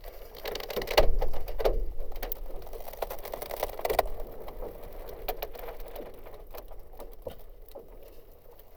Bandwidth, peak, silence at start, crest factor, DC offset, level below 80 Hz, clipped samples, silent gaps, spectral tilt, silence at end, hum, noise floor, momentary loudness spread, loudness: over 20 kHz; -8 dBFS; 0 s; 24 dB; under 0.1%; -36 dBFS; under 0.1%; none; -4 dB/octave; 0 s; none; -50 dBFS; 20 LU; -35 LUFS